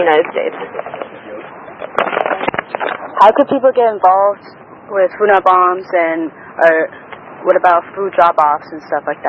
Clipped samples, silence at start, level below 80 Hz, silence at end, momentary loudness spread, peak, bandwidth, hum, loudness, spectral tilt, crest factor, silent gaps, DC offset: 0.2%; 0 s; -60 dBFS; 0 s; 18 LU; 0 dBFS; 7.4 kHz; none; -13 LUFS; -6 dB/octave; 14 dB; none; under 0.1%